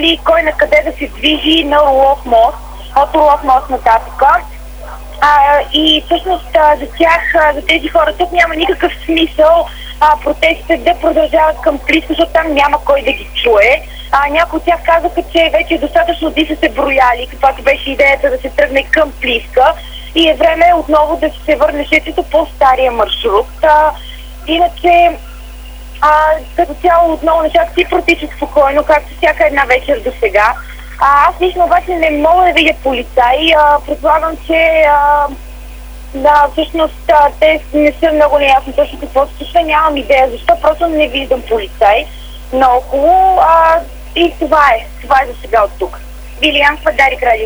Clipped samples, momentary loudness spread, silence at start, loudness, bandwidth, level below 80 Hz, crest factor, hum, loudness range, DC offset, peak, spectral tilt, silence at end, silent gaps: 0.2%; 7 LU; 0 s; -10 LUFS; over 20 kHz; -28 dBFS; 10 dB; 50 Hz at -30 dBFS; 2 LU; under 0.1%; 0 dBFS; -4.5 dB/octave; 0 s; none